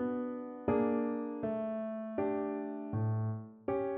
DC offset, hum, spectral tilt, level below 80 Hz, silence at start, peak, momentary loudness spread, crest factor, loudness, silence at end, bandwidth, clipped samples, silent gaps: under 0.1%; none; -9.5 dB/octave; -66 dBFS; 0 s; -18 dBFS; 7 LU; 16 dB; -36 LUFS; 0 s; 3.8 kHz; under 0.1%; none